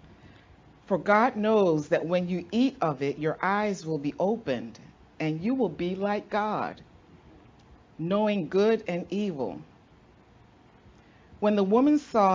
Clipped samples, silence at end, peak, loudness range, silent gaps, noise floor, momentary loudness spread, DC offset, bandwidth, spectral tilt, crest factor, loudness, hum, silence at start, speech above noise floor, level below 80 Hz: under 0.1%; 0 s; -8 dBFS; 5 LU; none; -57 dBFS; 10 LU; under 0.1%; 7.6 kHz; -7 dB/octave; 20 dB; -27 LUFS; none; 0.25 s; 31 dB; -62 dBFS